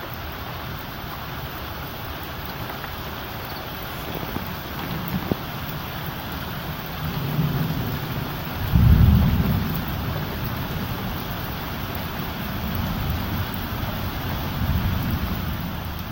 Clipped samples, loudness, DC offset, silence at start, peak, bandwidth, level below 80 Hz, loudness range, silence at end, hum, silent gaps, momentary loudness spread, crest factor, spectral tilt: under 0.1%; -26 LUFS; under 0.1%; 0 s; -4 dBFS; 17 kHz; -32 dBFS; 9 LU; 0 s; none; none; 9 LU; 20 dB; -6.5 dB/octave